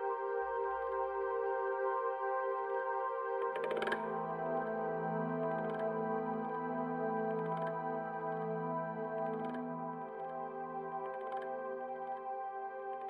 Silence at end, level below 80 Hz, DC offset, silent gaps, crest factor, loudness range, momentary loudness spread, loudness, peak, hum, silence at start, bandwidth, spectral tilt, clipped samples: 0 s; -76 dBFS; under 0.1%; none; 16 dB; 5 LU; 6 LU; -38 LUFS; -22 dBFS; none; 0 s; 10.5 kHz; -8 dB/octave; under 0.1%